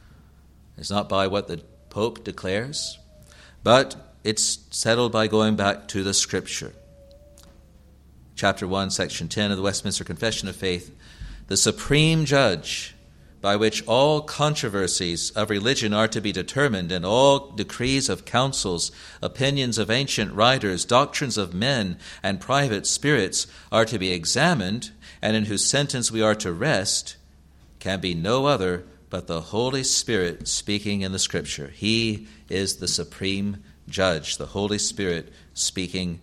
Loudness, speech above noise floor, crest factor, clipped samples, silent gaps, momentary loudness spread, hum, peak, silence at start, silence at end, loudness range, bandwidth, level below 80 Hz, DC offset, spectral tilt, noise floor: -23 LUFS; 29 dB; 22 dB; under 0.1%; none; 11 LU; none; -2 dBFS; 0.8 s; 0.05 s; 4 LU; 15 kHz; -48 dBFS; under 0.1%; -3.5 dB/octave; -52 dBFS